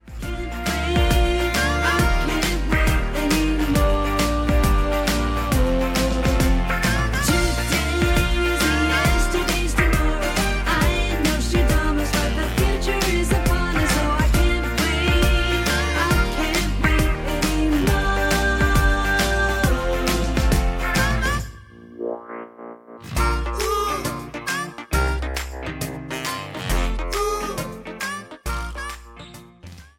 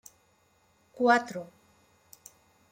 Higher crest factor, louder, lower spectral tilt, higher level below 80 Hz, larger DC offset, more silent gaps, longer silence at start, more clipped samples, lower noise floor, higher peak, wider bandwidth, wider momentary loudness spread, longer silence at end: about the same, 16 dB vs 20 dB; first, -21 LUFS vs -26 LUFS; about the same, -4.5 dB/octave vs -4 dB/octave; first, -24 dBFS vs -76 dBFS; neither; neither; second, 0.05 s vs 0.95 s; neither; second, -42 dBFS vs -67 dBFS; first, -4 dBFS vs -12 dBFS; about the same, 17 kHz vs 16.5 kHz; second, 10 LU vs 27 LU; second, 0.15 s vs 1.25 s